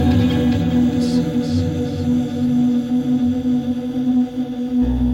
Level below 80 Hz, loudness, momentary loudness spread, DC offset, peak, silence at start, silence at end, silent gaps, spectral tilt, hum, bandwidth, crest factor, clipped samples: -34 dBFS; -19 LUFS; 5 LU; under 0.1%; -4 dBFS; 0 s; 0 s; none; -8 dB/octave; none; 11 kHz; 12 dB; under 0.1%